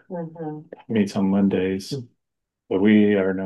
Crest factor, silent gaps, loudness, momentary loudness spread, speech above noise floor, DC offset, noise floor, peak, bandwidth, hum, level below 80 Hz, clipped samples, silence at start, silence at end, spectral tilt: 16 dB; none; -21 LUFS; 17 LU; 60 dB; under 0.1%; -81 dBFS; -6 dBFS; 11.5 kHz; none; -70 dBFS; under 0.1%; 0.1 s; 0 s; -7.5 dB/octave